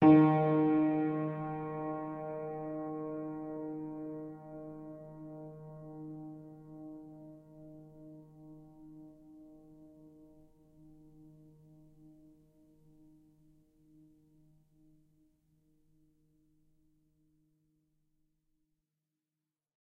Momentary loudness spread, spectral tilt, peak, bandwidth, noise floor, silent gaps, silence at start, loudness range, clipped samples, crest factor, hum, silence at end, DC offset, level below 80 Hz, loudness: 27 LU; -11 dB/octave; -12 dBFS; 3.9 kHz; under -90 dBFS; none; 0 s; 26 LU; under 0.1%; 24 dB; none; 7.85 s; under 0.1%; -72 dBFS; -34 LUFS